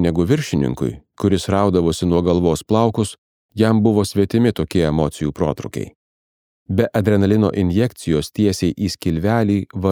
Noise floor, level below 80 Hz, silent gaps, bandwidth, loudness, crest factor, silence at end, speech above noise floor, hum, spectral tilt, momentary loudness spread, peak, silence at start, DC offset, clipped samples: under -90 dBFS; -40 dBFS; 3.18-3.49 s, 5.95-6.66 s; 17.5 kHz; -18 LUFS; 16 dB; 0 s; over 73 dB; none; -7 dB/octave; 7 LU; -2 dBFS; 0 s; under 0.1%; under 0.1%